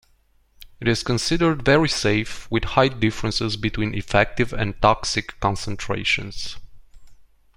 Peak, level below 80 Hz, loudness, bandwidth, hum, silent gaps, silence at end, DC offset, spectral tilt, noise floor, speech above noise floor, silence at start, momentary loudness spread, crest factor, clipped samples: -2 dBFS; -38 dBFS; -22 LUFS; 16 kHz; none; none; 0.35 s; under 0.1%; -4.5 dB/octave; -60 dBFS; 39 dB; 0.6 s; 8 LU; 20 dB; under 0.1%